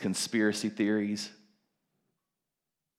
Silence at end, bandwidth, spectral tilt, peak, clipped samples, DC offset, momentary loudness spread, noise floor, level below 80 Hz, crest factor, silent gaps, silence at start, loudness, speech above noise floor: 1.65 s; 16 kHz; -4 dB/octave; -14 dBFS; under 0.1%; under 0.1%; 8 LU; -87 dBFS; -86 dBFS; 20 dB; none; 0 s; -30 LUFS; 57 dB